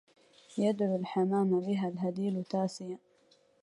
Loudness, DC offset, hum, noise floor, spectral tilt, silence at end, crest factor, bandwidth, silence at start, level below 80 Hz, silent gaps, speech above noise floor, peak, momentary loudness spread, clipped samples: -32 LUFS; under 0.1%; none; -67 dBFS; -7.5 dB/octave; 0.65 s; 16 dB; 11 kHz; 0.5 s; -78 dBFS; none; 36 dB; -18 dBFS; 13 LU; under 0.1%